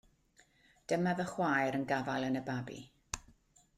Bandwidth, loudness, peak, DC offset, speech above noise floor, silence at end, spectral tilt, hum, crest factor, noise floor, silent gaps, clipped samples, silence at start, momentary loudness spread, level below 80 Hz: 14 kHz; -35 LUFS; -16 dBFS; under 0.1%; 34 dB; 0.6 s; -5.5 dB/octave; none; 20 dB; -69 dBFS; none; under 0.1%; 0.9 s; 14 LU; -64 dBFS